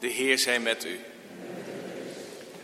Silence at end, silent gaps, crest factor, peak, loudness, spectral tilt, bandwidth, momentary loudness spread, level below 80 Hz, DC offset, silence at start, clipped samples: 0 s; none; 22 dB; -10 dBFS; -27 LUFS; -1.5 dB/octave; 16 kHz; 19 LU; -78 dBFS; under 0.1%; 0 s; under 0.1%